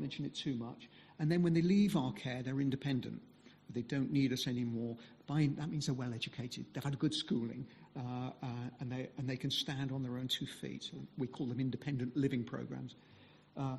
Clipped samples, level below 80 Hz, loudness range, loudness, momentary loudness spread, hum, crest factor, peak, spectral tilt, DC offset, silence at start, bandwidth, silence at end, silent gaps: under 0.1%; -70 dBFS; 5 LU; -38 LUFS; 12 LU; none; 16 dB; -22 dBFS; -6 dB/octave; under 0.1%; 0 s; 12.5 kHz; 0 s; none